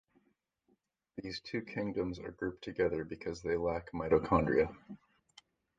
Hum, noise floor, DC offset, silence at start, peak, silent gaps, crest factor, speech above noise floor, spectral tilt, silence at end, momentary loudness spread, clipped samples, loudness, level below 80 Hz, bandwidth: none; -77 dBFS; under 0.1%; 1.15 s; -12 dBFS; none; 24 dB; 43 dB; -7 dB/octave; 0.8 s; 17 LU; under 0.1%; -35 LUFS; -56 dBFS; 7.6 kHz